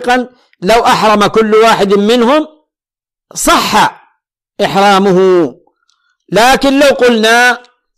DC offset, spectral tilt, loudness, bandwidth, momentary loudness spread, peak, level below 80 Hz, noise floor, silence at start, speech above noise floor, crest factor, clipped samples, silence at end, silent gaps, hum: under 0.1%; -4 dB/octave; -9 LUFS; 15.5 kHz; 9 LU; 0 dBFS; -38 dBFS; -88 dBFS; 0 s; 79 dB; 10 dB; under 0.1%; 0.4 s; none; none